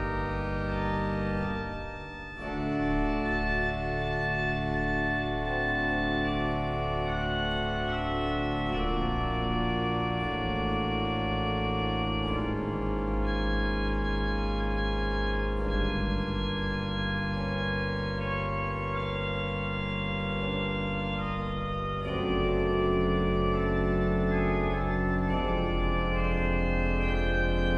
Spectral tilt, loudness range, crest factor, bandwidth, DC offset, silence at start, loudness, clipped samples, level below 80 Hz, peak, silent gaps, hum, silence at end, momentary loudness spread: -7.5 dB/octave; 3 LU; 14 dB; 7 kHz; under 0.1%; 0 s; -30 LUFS; under 0.1%; -34 dBFS; -14 dBFS; none; none; 0 s; 4 LU